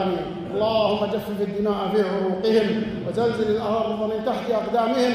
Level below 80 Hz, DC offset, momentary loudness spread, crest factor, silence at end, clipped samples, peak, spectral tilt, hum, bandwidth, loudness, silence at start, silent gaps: -52 dBFS; under 0.1%; 5 LU; 14 dB; 0 s; under 0.1%; -8 dBFS; -6.5 dB/octave; none; 15.5 kHz; -23 LUFS; 0 s; none